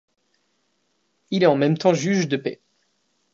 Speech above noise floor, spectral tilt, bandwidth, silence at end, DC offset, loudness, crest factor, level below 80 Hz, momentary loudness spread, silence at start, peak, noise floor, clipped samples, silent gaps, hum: 51 dB; -6 dB/octave; 7.6 kHz; 0.8 s; under 0.1%; -21 LUFS; 20 dB; -72 dBFS; 10 LU; 1.3 s; -4 dBFS; -70 dBFS; under 0.1%; none; none